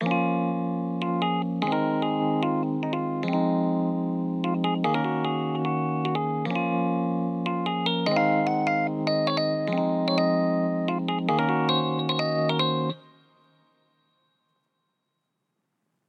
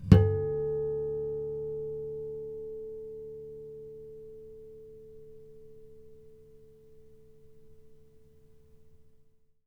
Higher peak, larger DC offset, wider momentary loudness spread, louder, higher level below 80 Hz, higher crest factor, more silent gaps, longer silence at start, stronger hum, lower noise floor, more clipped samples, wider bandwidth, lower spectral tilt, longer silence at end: second, -10 dBFS vs -2 dBFS; neither; second, 5 LU vs 22 LU; first, -26 LUFS vs -32 LUFS; second, under -90 dBFS vs -48 dBFS; second, 16 dB vs 30 dB; neither; about the same, 0 s vs 0 s; neither; first, -79 dBFS vs -61 dBFS; neither; first, 6.8 kHz vs 6 kHz; second, -7.5 dB/octave vs -9.5 dB/octave; first, 3.1 s vs 0.55 s